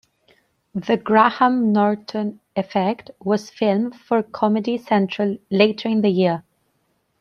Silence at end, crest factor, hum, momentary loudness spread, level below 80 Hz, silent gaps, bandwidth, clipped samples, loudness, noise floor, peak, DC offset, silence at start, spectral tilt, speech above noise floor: 0.8 s; 20 dB; none; 11 LU; -66 dBFS; none; 6.8 kHz; under 0.1%; -20 LUFS; -68 dBFS; -2 dBFS; under 0.1%; 0.75 s; -7 dB/octave; 48 dB